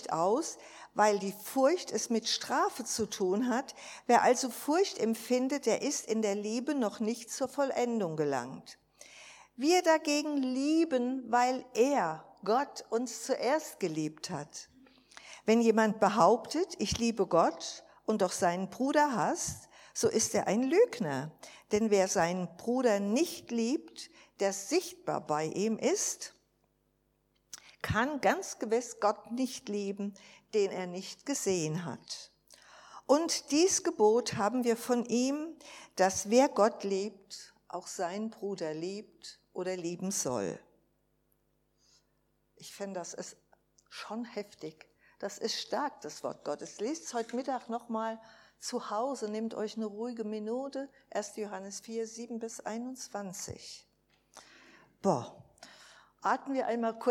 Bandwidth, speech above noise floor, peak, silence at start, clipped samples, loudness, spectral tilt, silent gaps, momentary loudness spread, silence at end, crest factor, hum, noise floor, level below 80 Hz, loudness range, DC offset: 18.5 kHz; 43 dB; -10 dBFS; 0 s; under 0.1%; -32 LUFS; -4 dB/octave; none; 16 LU; 0 s; 22 dB; none; -75 dBFS; -68 dBFS; 10 LU; under 0.1%